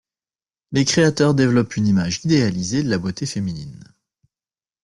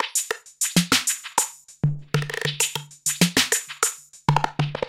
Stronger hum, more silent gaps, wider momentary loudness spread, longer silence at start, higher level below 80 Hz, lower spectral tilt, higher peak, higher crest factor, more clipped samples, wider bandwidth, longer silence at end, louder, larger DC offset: neither; neither; about the same, 10 LU vs 8 LU; first, 0.7 s vs 0 s; about the same, -50 dBFS vs -54 dBFS; first, -5.5 dB/octave vs -3 dB/octave; about the same, -4 dBFS vs -2 dBFS; second, 16 dB vs 22 dB; neither; second, 11.5 kHz vs 17 kHz; first, 1.05 s vs 0 s; first, -19 LUFS vs -23 LUFS; neither